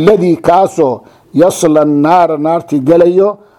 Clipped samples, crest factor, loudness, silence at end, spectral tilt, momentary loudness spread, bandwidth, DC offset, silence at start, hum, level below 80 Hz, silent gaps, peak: 0.5%; 10 dB; -10 LUFS; 0.25 s; -6.5 dB/octave; 6 LU; 18.5 kHz; under 0.1%; 0 s; none; -48 dBFS; none; 0 dBFS